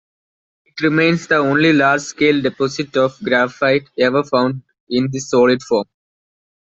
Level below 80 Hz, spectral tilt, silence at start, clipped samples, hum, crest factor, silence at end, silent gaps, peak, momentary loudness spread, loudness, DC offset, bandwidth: -58 dBFS; -5 dB/octave; 0.75 s; under 0.1%; none; 14 dB; 0.8 s; 4.80-4.87 s; -2 dBFS; 8 LU; -16 LUFS; under 0.1%; 8 kHz